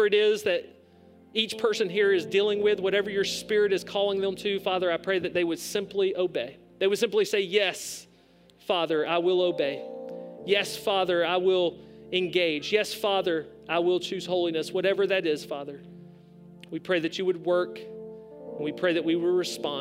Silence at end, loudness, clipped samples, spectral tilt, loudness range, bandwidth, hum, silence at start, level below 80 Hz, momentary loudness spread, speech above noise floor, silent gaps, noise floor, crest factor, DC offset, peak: 0 s; -26 LUFS; under 0.1%; -4 dB/octave; 4 LU; 16 kHz; none; 0 s; -68 dBFS; 13 LU; 32 dB; none; -58 dBFS; 18 dB; under 0.1%; -8 dBFS